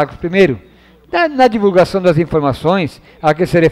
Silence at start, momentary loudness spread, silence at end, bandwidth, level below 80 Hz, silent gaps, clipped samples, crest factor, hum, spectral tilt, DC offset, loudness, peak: 0 s; 6 LU; 0 s; 14 kHz; -40 dBFS; none; under 0.1%; 12 dB; none; -7 dB/octave; under 0.1%; -13 LUFS; -2 dBFS